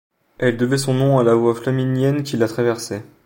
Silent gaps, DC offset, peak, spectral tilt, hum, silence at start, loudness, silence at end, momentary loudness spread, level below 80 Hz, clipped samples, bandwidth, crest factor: none; under 0.1%; -2 dBFS; -6.5 dB/octave; none; 0.4 s; -18 LUFS; 0.2 s; 6 LU; -58 dBFS; under 0.1%; 17 kHz; 16 dB